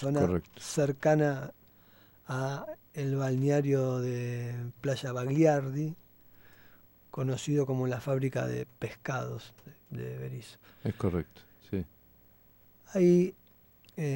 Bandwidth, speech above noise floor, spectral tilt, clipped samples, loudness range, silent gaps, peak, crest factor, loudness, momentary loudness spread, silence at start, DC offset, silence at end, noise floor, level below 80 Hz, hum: 16 kHz; 30 dB; -7 dB/octave; under 0.1%; 8 LU; none; -14 dBFS; 18 dB; -31 LUFS; 16 LU; 0 s; under 0.1%; 0 s; -61 dBFS; -60 dBFS; none